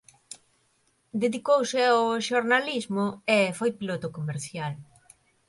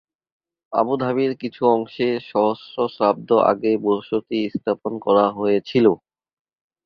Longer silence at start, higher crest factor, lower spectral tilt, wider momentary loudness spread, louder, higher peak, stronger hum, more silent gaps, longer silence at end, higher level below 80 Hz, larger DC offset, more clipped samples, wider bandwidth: second, 0.3 s vs 0.7 s; about the same, 18 dB vs 18 dB; second, -4.5 dB/octave vs -8.5 dB/octave; first, 19 LU vs 7 LU; second, -26 LUFS vs -20 LUFS; second, -8 dBFS vs -2 dBFS; neither; neither; second, 0.65 s vs 0.9 s; second, -70 dBFS vs -64 dBFS; neither; neither; first, 11.5 kHz vs 6.2 kHz